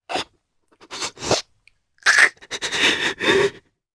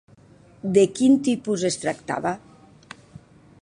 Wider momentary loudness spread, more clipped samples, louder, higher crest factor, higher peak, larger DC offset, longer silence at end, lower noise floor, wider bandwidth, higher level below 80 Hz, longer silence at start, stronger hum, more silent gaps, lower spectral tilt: second, 15 LU vs 18 LU; neither; first, -19 LUFS vs -22 LUFS; about the same, 22 dB vs 20 dB; first, 0 dBFS vs -4 dBFS; neither; second, 0.35 s vs 1.25 s; first, -64 dBFS vs -51 dBFS; about the same, 11 kHz vs 11 kHz; first, -54 dBFS vs -62 dBFS; second, 0.1 s vs 0.65 s; neither; neither; second, -1.5 dB/octave vs -5 dB/octave